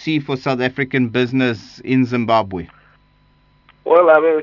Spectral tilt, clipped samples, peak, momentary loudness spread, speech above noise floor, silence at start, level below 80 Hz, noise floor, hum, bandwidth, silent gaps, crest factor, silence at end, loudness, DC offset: -7.5 dB/octave; under 0.1%; 0 dBFS; 16 LU; 39 dB; 0 s; -56 dBFS; -55 dBFS; 50 Hz at -55 dBFS; 6 kHz; none; 16 dB; 0 s; -16 LUFS; under 0.1%